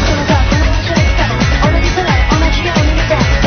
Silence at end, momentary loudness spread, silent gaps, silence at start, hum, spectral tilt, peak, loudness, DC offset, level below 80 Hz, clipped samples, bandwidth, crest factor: 0 s; 1 LU; none; 0 s; none; -5.5 dB/octave; 0 dBFS; -12 LUFS; under 0.1%; -14 dBFS; under 0.1%; 6.6 kHz; 10 dB